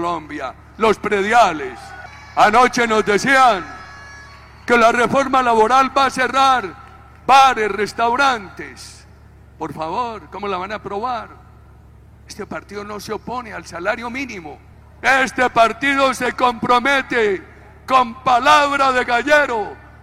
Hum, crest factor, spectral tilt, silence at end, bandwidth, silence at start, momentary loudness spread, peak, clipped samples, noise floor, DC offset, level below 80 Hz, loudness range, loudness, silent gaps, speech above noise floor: none; 16 dB; -3.5 dB/octave; 0.25 s; 15.5 kHz; 0 s; 19 LU; -2 dBFS; under 0.1%; -44 dBFS; under 0.1%; -46 dBFS; 13 LU; -16 LUFS; none; 27 dB